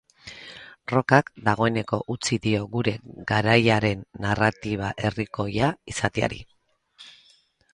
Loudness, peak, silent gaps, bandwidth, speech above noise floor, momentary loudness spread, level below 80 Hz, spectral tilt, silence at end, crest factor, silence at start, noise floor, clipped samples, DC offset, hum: -24 LUFS; 0 dBFS; none; 11 kHz; 37 dB; 18 LU; -50 dBFS; -5.5 dB/octave; 0.65 s; 24 dB; 0.25 s; -60 dBFS; under 0.1%; under 0.1%; none